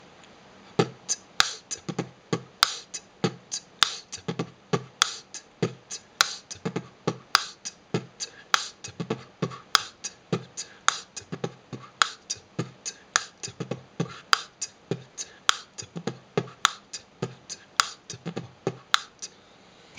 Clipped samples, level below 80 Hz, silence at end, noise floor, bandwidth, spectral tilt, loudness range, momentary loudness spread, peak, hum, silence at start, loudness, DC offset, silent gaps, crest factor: under 0.1%; -68 dBFS; 0 s; -54 dBFS; 10.5 kHz; -2.5 dB/octave; 3 LU; 14 LU; 0 dBFS; none; 0.05 s; -29 LUFS; under 0.1%; none; 32 dB